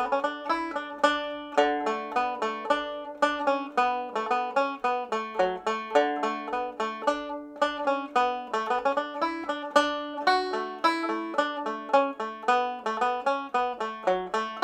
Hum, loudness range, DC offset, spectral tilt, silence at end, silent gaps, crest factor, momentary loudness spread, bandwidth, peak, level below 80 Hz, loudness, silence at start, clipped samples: none; 2 LU; under 0.1%; -3 dB/octave; 0 s; none; 22 dB; 6 LU; 12 kHz; -6 dBFS; -66 dBFS; -28 LUFS; 0 s; under 0.1%